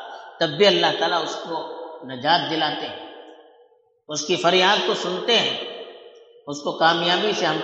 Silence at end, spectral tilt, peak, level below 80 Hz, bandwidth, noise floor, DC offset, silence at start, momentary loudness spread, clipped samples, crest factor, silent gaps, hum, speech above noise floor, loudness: 0 s; -3 dB/octave; -4 dBFS; -76 dBFS; 8.2 kHz; -57 dBFS; under 0.1%; 0 s; 18 LU; under 0.1%; 20 dB; none; none; 36 dB; -20 LUFS